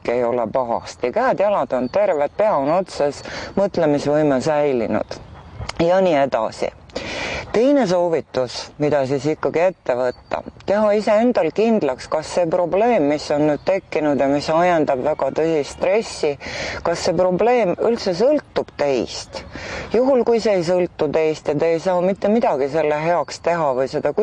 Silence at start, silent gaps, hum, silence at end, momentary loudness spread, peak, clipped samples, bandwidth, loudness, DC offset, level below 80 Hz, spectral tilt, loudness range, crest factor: 0.05 s; none; none; 0 s; 9 LU; -6 dBFS; under 0.1%; 9.8 kHz; -19 LUFS; under 0.1%; -48 dBFS; -5.5 dB/octave; 2 LU; 12 dB